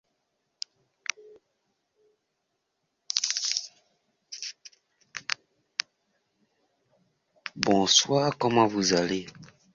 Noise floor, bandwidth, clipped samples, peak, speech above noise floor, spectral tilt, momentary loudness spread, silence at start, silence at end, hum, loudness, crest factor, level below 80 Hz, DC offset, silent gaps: -79 dBFS; 7.8 kHz; under 0.1%; -4 dBFS; 55 dB; -3 dB/octave; 21 LU; 3.1 s; 0.3 s; none; -26 LUFS; 28 dB; -68 dBFS; under 0.1%; none